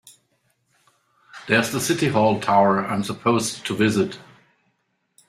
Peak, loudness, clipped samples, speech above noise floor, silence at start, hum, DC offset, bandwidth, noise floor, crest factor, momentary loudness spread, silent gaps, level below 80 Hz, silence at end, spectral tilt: -2 dBFS; -21 LUFS; under 0.1%; 51 dB; 1.35 s; none; under 0.1%; 15.5 kHz; -71 dBFS; 20 dB; 8 LU; none; -62 dBFS; 1.05 s; -4.5 dB/octave